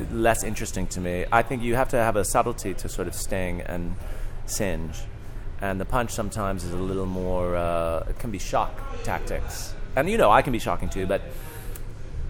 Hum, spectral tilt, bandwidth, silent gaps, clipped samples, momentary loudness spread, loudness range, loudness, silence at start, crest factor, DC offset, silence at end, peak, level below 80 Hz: none; -5 dB/octave; 17.5 kHz; none; under 0.1%; 15 LU; 5 LU; -26 LUFS; 0 s; 22 dB; under 0.1%; 0 s; -2 dBFS; -32 dBFS